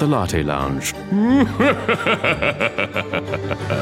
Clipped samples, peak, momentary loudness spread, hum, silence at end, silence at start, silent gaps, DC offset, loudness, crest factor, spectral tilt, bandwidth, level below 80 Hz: under 0.1%; -2 dBFS; 8 LU; none; 0 s; 0 s; none; under 0.1%; -19 LUFS; 18 dB; -5.5 dB/octave; 16.5 kHz; -40 dBFS